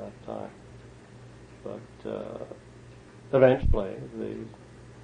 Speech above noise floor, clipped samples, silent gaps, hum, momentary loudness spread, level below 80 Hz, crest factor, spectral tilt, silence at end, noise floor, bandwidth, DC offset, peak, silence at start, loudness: 25 dB; under 0.1%; none; 60 Hz at -50 dBFS; 28 LU; -38 dBFS; 24 dB; -8 dB/octave; 0 s; -49 dBFS; 9.8 kHz; under 0.1%; -6 dBFS; 0 s; -28 LUFS